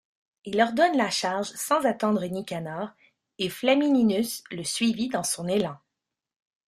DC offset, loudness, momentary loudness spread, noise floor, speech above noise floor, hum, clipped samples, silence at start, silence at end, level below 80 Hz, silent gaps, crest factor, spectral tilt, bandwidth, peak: under 0.1%; -26 LUFS; 11 LU; -85 dBFS; 60 dB; none; under 0.1%; 0.45 s; 0.9 s; -68 dBFS; none; 18 dB; -4 dB/octave; 15.5 kHz; -8 dBFS